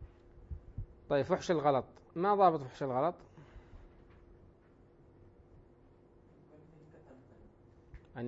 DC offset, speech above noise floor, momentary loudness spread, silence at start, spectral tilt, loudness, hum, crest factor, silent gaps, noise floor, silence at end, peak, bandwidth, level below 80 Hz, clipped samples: under 0.1%; 31 dB; 29 LU; 0 s; -5.5 dB/octave; -32 LUFS; none; 24 dB; none; -62 dBFS; 0 s; -14 dBFS; 7.6 kHz; -58 dBFS; under 0.1%